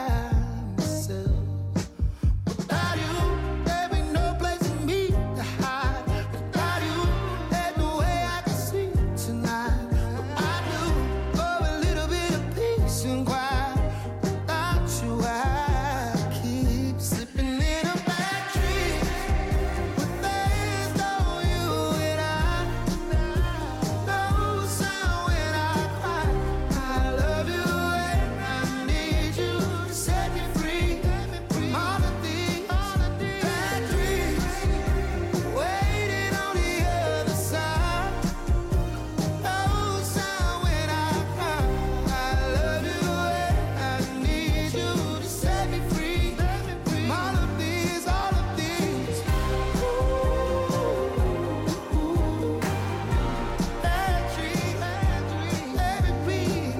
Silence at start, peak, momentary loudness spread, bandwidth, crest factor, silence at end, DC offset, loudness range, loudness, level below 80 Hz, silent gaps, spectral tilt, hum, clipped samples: 0 s; -16 dBFS; 3 LU; 16.5 kHz; 10 dB; 0 s; under 0.1%; 1 LU; -27 LUFS; -30 dBFS; none; -5.5 dB/octave; none; under 0.1%